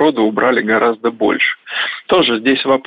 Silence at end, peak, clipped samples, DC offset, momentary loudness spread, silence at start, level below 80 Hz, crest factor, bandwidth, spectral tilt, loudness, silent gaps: 0.05 s; -2 dBFS; under 0.1%; under 0.1%; 5 LU; 0 s; -56 dBFS; 12 dB; 5 kHz; -7 dB/octave; -14 LUFS; none